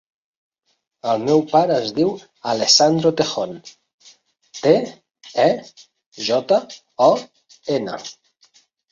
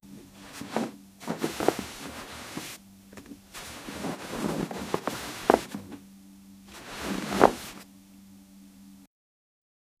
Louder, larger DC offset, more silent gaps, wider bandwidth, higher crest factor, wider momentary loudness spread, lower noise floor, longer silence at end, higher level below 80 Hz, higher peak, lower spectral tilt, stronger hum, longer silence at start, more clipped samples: first, -19 LUFS vs -31 LUFS; neither; first, 3.94-3.98 s, 6.06-6.12 s vs none; second, 7.8 kHz vs 15.5 kHz; second, 20 dB vs 32 dB; second, 17 LU vs 26 LU; first, -57 dBFS vs -52 dBFS; second, 0.8 s vs 0.95 s; second, -64 dBFS vs -56 dBFS; about the same, 0 dBFS vs 0 dBFS; about the same, -4 dB/octave vs -4.5 dB/octave; neither; first, 1.05 s vs 0.05 s; neither